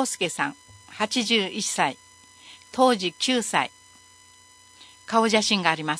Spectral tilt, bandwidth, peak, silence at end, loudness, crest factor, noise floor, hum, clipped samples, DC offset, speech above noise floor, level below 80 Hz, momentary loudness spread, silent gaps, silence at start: -2.5 dB/octave; 11 kHz; -2 dBFS; 0 s; -23 LUFS; 24 dB; -53 dBFS; 60 Hz at -50 dBFS; under 0.1%; under 0.1%; 29 dB; -70 dBFS; 12 LU; none; 0 s